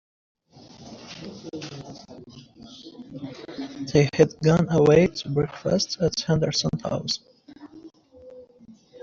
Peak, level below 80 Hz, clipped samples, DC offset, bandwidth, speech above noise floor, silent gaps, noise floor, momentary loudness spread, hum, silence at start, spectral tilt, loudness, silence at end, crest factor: -4 dBFS; -52 dBFS; under 0.1%; under 0.1%; 7.6 kHz; 30 dB; none; -51 dBFS; 24 LU; none; 0.8 s; -5.5 dB/octave; -22 LUFS; 0.05 s; 22 dB